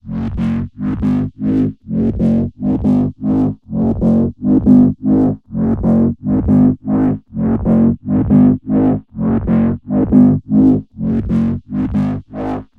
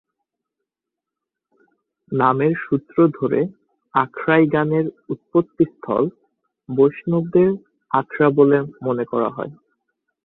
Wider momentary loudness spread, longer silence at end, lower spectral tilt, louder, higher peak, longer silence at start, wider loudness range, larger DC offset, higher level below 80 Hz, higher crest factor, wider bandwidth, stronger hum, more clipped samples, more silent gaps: about the same, 8 LU vs 10 LU; second, 0.15 s vs 0.7 s; about the same, -11.5 dB/octave vs -11 dB/octave; first, -15 LUFS vs -19 LUFS; about the same, 0 dBFS vs -2 dBFS; second, 0.05 s vs 2.1 s; about the same, 3 LU vs 3 LU; neither; first, -32 dBFS vs -60 dBFS; about the same, 14 dB vs 18 dB; second, 3.7 kHz vs 4.1 kHz; neither; neither; neither